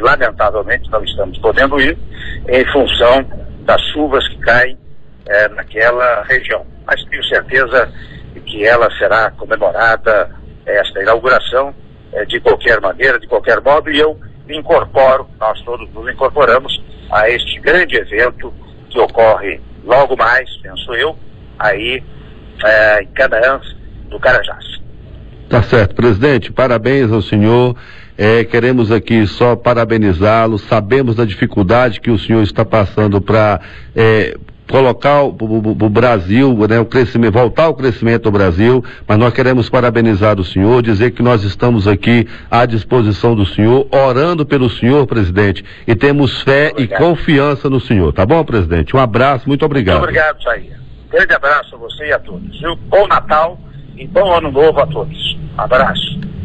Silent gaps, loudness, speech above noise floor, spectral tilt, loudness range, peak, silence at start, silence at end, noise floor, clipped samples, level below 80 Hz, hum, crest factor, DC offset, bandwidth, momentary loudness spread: none; -12 LUFS; 20 dB; -7.5 dB/octave; 2 LU; 0 dBFS; 0 s; 0 s; -32 dBFS; under 0.1%; -32 dBFS; none; 12 dB; under 0.1%; 8.4 kHz; 10 LU